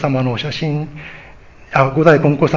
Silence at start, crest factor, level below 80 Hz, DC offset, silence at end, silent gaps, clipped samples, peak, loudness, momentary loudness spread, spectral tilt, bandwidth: 0 s; 16 dB; -46 dBFS; under 0.1%; 0 s; none; under 0.1%; 0 dBFS; -15 LUFS; 18 LU; -7.5 dB/octave; 7.6 kHz